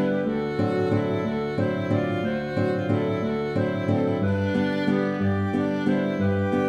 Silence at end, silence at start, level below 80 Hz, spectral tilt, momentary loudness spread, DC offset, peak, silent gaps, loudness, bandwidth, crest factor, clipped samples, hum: 0 s; 0 s; -56 dBFS; -8.5 dB/octave; 2 LU; under 0.1%; -10 dBFS; none; -25 LUFS; 8.6 kHz; 14 dB; under 0.1%; none